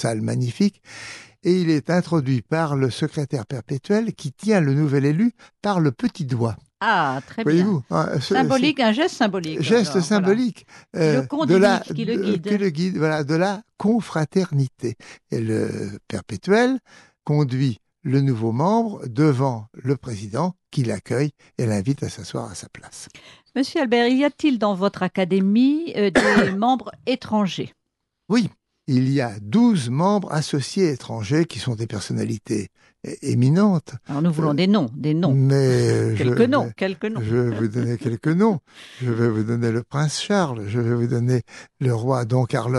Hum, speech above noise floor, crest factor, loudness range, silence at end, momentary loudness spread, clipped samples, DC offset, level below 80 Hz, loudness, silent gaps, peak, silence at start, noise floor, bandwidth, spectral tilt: none; 57 dB; 16 dB; 4 LU; 0 s; 11 LU; under 0.1%; under 0.1%; -60 dBFS; -21 LUFS; none; -6 dBFS; 0 s; -78 dBFS; 12 kHz; -6.5 dB/octave